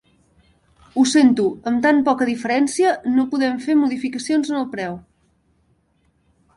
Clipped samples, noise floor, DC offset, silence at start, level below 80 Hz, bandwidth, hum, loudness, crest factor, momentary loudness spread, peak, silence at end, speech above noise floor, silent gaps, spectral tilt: under 0.1%; -63 dBFS; under 0.1%; 0.95 s; -60 dBFS; 11.5 kHz; none; -19 LUFS; 16 dB; 11 LU; -4 dBFS; 1.55 s; 45 dB; none; -4 dB/octave